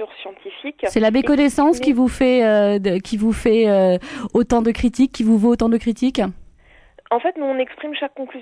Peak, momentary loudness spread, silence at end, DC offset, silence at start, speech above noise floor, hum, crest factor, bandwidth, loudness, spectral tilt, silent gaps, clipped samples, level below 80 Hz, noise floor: -4 dBFS; 11 LU; 0 s; under 0.1%; 0 s; 32 dB; none; 14 dB; 11 kHz; -18 LUFS; -6 dB/octave; none; under 0.1%; -40 dBFS; -50 dBFS